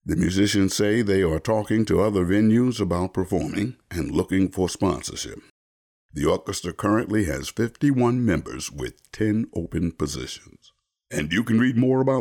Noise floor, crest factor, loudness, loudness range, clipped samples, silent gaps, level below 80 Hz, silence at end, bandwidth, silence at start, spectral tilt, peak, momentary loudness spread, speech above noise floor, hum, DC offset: under -90 dBFS; 12 dB; -23 LUFS; 5 LU; under 0.1%; 5.50-6.09 s; -44 dBFS; 0 s; 19 kHz; 0.05 s; -6 dB/octave; -10 dBFS; 11 LU; over 67 dB; none; under 0.1%